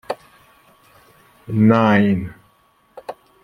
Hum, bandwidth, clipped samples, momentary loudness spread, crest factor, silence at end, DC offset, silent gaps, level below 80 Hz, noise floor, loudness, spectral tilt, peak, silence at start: none; 10.5 kHz; under 0.1%; 23 LU; 18 dB; 0.3 s; under 0.1%; none; -56 dBFS; -58 dBFS; -16 LUFS; -8.5 dB/octave; -2 dBFS; 0.1 s